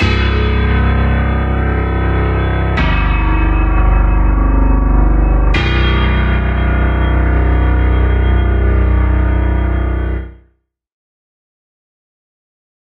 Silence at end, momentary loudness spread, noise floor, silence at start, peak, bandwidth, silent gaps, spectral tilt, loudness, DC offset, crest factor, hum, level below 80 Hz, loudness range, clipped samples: 2.6 s; 2 LU; -58 dBFS; 0 s; 0 dBFS; 5.2 kHz; none; -8.5 dB/octave; -14 LUFS; under 0.1%; 12 dB; none; -14 dBFS; 5 LU; under 0.1%